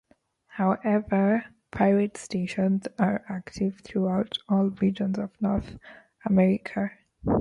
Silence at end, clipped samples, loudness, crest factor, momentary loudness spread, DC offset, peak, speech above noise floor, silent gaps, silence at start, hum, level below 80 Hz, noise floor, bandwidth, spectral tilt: 0 s; under 0.1%; -26 LUFS; 18 dB; 12 LU; under 0.1%; -8 dBFS; 36 dB; none; 0.55 s; none; -52 dBFS; -62 dBFS; 11 kHz; -7.5 dB/octave